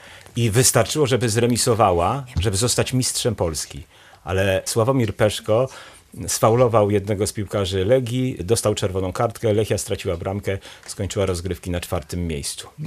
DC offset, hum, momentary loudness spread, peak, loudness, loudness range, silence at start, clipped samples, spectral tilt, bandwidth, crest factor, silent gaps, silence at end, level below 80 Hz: under 0.1%; none; 11 LU; -2 dBFS; -21 LUFS; 5 LU; 0 s; under 0.1%; -4.5 dB/octave; 15.5 kHz; 20 dB; none; 0 s; -46 dBFS